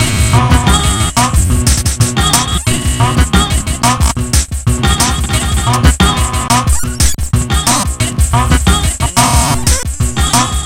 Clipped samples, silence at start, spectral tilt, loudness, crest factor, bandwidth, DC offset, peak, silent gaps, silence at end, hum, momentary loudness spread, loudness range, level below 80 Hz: 0.3%; 0 s; -3.5 dB/octave; -11 LUFS; 10 dB; 17 kHz; under 0.1%; 0 dBFS; none; 0 s; none; 4 LU; 1 LU; -16 dBFS